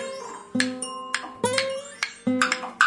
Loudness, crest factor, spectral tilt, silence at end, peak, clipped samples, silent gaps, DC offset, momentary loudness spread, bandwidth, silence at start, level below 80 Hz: -27 LUFS; 24 dB; -2.5 dB/octave; 0 s; -4 dBFS; under 0.1%; none; under 0.1%; 9 LU; 11.5 kHz; 0 s; -68 dBFS